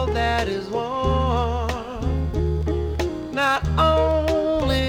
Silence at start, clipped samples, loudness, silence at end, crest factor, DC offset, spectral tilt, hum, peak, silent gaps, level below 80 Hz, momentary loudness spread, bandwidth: 0 s; under 0.1%; -22 LUFS; 0 s; 14 dB; under 0.1%; -6.5 dB/octave; none; -8 dBFS; none; -30 dBFS; 7 LU; 15 kHz